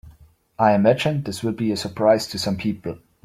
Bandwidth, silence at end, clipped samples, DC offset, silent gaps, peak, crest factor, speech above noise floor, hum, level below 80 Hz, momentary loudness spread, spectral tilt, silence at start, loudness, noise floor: 15.5 kHz; 0.3 s; under 0.1%; under 0.1%; none; -2 dBFS; 18 dB; 31 dB; none; -54 dBFS; 10 LU; -6 dB/octave; 0.05 s; -21 LUFS; -51 dBFS